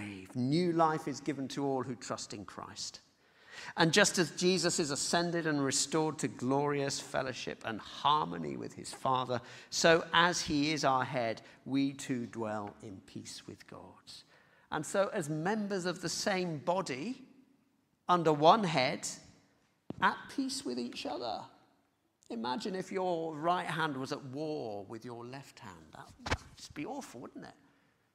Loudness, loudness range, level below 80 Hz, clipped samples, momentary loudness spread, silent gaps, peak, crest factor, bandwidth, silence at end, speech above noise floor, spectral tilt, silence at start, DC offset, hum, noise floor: -33 LUFS; 9 LU; -66 dBFS; under 0.1%; 20 LU; none; -10 dBFS; 24 dB; 15.5 kHz; 0.65 s; 41 dB; -4 dB/octave; 0 s; under 0.1%; none; -75 dBFS